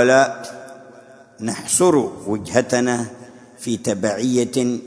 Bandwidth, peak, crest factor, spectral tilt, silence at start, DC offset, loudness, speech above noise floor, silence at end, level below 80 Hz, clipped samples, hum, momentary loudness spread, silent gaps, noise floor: 11 kHz; 0 dBFS; 20 dB; -4 dB/octave; 0 s; under 0.1%; -19 LUFS; 26 dB; 0 s; -58 dBFS; under 0.1%; none; 17 LU; none; -45 dBFS